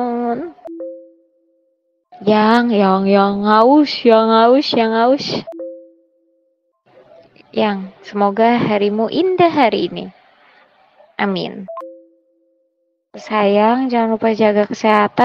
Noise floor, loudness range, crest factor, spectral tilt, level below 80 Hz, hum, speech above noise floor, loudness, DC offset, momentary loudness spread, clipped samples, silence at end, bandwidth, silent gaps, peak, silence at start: -67 dBFS; 11 LU; 16 dB; -6.5 dB/octave; -60 dBFS; none; 53 dB; -15 LUFS; under 0.1%; 19 LU; under 0.1%; 0 s; 7.2 kHz; none; 0 dBFS; 0 s